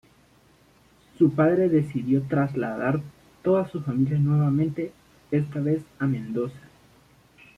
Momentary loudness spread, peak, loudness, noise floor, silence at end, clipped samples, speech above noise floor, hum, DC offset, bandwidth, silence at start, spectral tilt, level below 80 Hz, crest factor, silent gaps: 10 LU; -8 dBFS; -25 LUFS; -58 dBFS; 1 s; under 0.1%; 35 dB; none; under 0.1%; 6.4 kHz; 1.2 s; -10 dB/octave; -60 dBFS; 16 dB; none